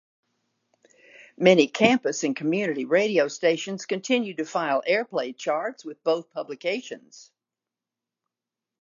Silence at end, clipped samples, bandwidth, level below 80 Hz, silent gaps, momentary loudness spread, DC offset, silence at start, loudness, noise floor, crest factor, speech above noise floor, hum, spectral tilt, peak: 1.6 s; under 0.1%; 7.6 kHz; -76 dBFS; none; 11 LU; under 0.1%; 1.2 s; -24 LUFS; -89 dBFS; 24 dB; 65 dB; none; -4.5 dB/octave; -2 dBFS